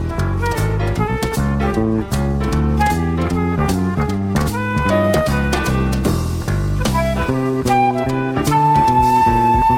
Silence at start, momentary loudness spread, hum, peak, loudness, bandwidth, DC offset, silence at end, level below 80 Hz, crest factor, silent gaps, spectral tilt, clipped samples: 0 s; 6 LU; none; -4 dBFS; -17 LUFS; 16.5 kHz; under 0.1%; 0 s; -26 dBFS; 12 dB; none; -6.5 dB/octave; under 0.1%